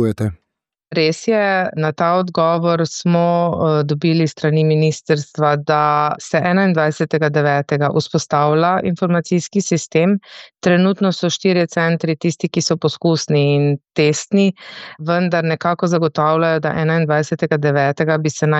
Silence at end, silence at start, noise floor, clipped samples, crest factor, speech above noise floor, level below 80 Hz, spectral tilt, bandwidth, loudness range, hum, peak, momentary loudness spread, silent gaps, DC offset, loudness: 0 s; 0 s; -77 dBFS; under 0.1%; 14 dB; 61 dB; -56 dBFS; -6 dB/octave; 8.4 kHz; 1 LU; none; -2 dBFS; 4 LU; none; under 0.1%; -16 LUFS